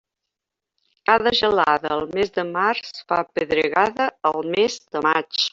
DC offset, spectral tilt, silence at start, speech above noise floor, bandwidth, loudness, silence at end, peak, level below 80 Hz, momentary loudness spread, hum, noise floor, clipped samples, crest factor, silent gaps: under 0.1%; -3.5 dB/octave; 1.1 s; 64 dB; 7.8 kHz; -21 LUFS; 0.05 s; -2 dBFS; -58 dBFS; 6 LU; none; -85 dBFS; under 0.1%; 20 dB; none